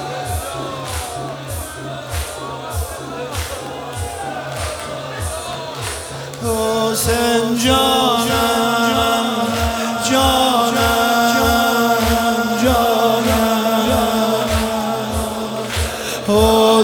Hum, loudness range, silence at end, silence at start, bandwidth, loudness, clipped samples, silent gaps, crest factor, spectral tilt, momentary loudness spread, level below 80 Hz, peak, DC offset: none; 10 LU; 0 s; 0 s; 19 kHz; -17 LUFS; under 0.1%; none; 16 dB; -4 dB/octave; 12 LU; -32 dBFS; 0 dBFS; under 0.1%